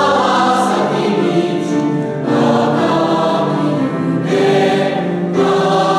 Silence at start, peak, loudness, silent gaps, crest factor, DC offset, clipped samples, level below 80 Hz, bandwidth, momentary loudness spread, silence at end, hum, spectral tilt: 0 s; -2 dBFS; -14 LUFS; none; 12 dB; under 0.1%; under 0.1%; -60 dBFS; 13 kHz; 4 LU; 0 s; none; -6 dB/octave